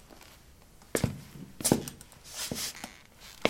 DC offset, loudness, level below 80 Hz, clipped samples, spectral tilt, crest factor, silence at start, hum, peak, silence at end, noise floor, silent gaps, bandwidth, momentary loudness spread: under 0.1%; -33 LUFS; -56 dBFS; under 0.1%; -3.5 dB/octave; 34 dB; 0 s; none; -2 dBFS; 0 s; -55 dBFS; none; 16.5 kHz; 23 LU